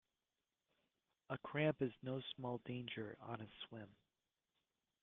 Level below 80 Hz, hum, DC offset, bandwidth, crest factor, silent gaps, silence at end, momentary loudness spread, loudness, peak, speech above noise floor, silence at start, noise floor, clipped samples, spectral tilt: -80 dBFS; none; under 0.1%; 4.1 kHz; 22 dB; none; 1.1 s; 14 LU; -46 LUFS; -26 dBFS; over 45 dB; 1.3 s; under -90 dBFS; under 0.1%; -5 dB/octave